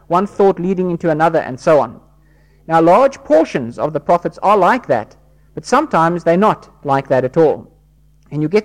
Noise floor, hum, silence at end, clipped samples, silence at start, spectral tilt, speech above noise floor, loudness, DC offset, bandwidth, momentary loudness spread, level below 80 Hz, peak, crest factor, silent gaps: -50 dBFS; none; 0 s; under 0.1%; 0.1 s; -7 dB/octave; 36 dB; -15 LUFS; under 0.1%; 13 kHz; 10 LU; -50 dBFS; -2 dBFS; 12 dB; none